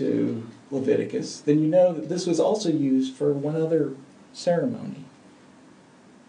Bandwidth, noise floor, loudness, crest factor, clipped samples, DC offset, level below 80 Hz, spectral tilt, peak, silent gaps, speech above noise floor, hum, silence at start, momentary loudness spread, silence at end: 10 kHz; -52 dBFS; -24 LUFS; 16 dB; under 0.1%; under 0.1%; -76 dBFS; -6.5 dB/octave; -8 dBFS; none; 29 dB; none; 0 s; 15 LU; 1.2 s